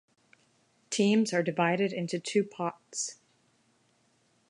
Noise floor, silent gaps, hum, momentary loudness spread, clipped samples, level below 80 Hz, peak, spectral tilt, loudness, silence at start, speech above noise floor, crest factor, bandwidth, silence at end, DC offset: -70 dBFS; none; none; 10 LU; under 0.1%; -82 dBFS; -12 dBFS; -4.5 dB/octave; -30 LUFS; 0.9 s; 41 dB; 20 dB; 11 kHz; 1.35 s; under 0.1%